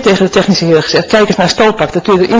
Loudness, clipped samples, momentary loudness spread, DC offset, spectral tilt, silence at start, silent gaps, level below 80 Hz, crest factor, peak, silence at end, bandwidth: -9 LUFS; 0.6%; 2 LU; under 0.1%; -5 dB/octave; 0 s; none; -38 dBFS; 10 dB; 0 dBFS; 0 s; 8 kHz